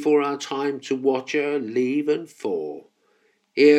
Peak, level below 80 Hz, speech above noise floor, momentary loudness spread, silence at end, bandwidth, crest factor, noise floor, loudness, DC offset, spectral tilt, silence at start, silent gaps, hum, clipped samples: -4 dBFS; -84 dBFS; 41 dB; 9 LU; 0 s; 10 kHz; 18 dB; -65 dBFS; -24 LUFS; under 0.1%; -5 dB/octave; 0 s; none; none; under 0.1%